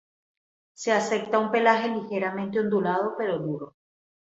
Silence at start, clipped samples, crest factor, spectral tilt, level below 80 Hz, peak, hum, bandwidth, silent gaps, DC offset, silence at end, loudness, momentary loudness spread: 0.8 s; under 0.1%; 22 dB; -5 dB/octave; -72 dBFS; -6 dBFS; none; 8.2 kHz; none; under 0.1%; 0.55 s; -25 LUFS; 11 LU